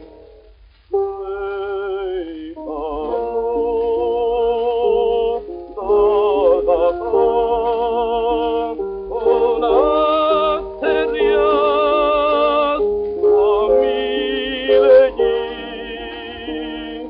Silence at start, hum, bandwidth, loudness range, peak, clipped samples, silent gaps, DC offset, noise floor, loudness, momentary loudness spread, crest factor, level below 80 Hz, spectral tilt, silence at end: 0 s; none; 5.2 kHz; 6 LU; -2 dBFS; under 0.1%; none; under 0.1%; -47 dBFS; -17 LUFS; 12 LU; 16 dB; -42 dBFS; -2 dB/octave; 0 s